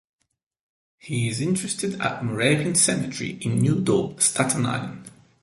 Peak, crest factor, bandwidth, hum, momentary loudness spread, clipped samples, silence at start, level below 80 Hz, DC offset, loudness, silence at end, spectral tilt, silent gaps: -4 dBFS; 20 dB; 12 kHz; none; 10 LU; under 0.1%; 1.05 s; -58 dBFS; under 0.1%; -23 LUFS; 0.3 s; -4 dB/octave; none